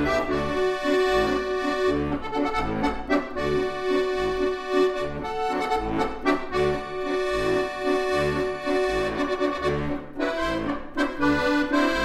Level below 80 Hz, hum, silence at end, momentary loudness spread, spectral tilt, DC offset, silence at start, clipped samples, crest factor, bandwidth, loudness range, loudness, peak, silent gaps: -42 dBFS; none; 0 s; 5 LU; -5.5 dB/octave; under 0.1%; 0 s; under 0.1%; 16 dB; 14 kHz; 1 LU; -25 LUFS; -8 dBFS; none